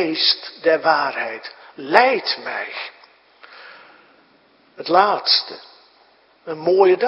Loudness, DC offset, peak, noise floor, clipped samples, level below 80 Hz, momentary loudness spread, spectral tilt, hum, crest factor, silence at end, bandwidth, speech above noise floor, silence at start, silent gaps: -18 LUFS; under 0.1%; 0 dBFS; -55 dBFS; under 0.1%; -72 dBFS; 20 LU; -5 dB/octave; none; 20 dB; 0 s; 6 kHz; 37 dB; 0 s; none